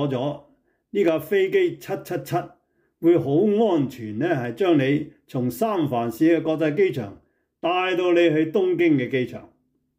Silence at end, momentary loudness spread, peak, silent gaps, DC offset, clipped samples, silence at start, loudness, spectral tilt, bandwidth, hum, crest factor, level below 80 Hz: 0.55 s; 11 LU; -8 dBFS; none; under 0.1%; under 0.1%; 0 s; -22 LUFS; -7 dB/octave; 16 kHz; none; 14 dB; -66 dBFS